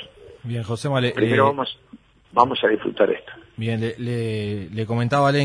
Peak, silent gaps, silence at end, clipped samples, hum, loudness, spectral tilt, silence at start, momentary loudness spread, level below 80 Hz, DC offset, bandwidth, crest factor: 0 dBFS; none; 0 s; under 0.1%; none; -22 LUFS; -6.5 dB/octave; 0 s; 12 LU; -56 dBFS; under 0.1%; 10.5 kHz; 22 dB